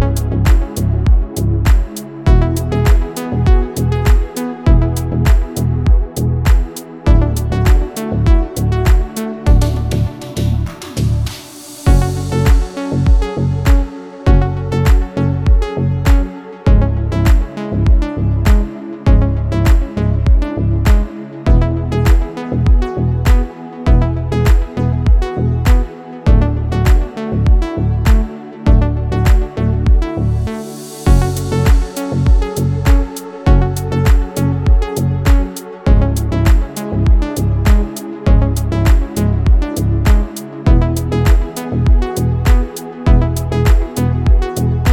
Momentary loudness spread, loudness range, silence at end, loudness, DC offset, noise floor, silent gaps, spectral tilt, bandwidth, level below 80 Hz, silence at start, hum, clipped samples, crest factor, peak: 6 LU; 1 LU; 0 s; -15 LUFS; under 0.1%; -32 dBFS; none; -7 dB/octave; 17 kHz; -14 dBFS; 0 s; none; under 0.1%; 12 dB; 0 dBFS